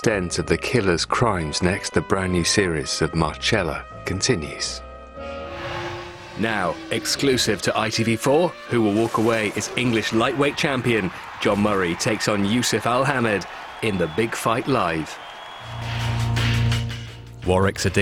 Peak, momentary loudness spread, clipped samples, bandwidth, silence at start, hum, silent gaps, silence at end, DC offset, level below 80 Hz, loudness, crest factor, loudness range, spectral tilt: -2 dBFS; 12 LU; under 0.1%; 17.5 kHz; 0 s; none; none; 0 s; under 0.1%; -42 dBFS; -22 LUFS; 20 dB; 4 LU; -4.5 dB/octave